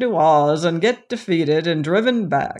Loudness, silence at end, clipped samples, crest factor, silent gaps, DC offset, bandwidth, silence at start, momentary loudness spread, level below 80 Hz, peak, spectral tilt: -18 LUFS; 0 s; under 0.1%; 14 dB; none; under 0.1%; 11 kHz; 0 s; 6 LU; -62 dBFS; -4 dBFS; -6 dB/octave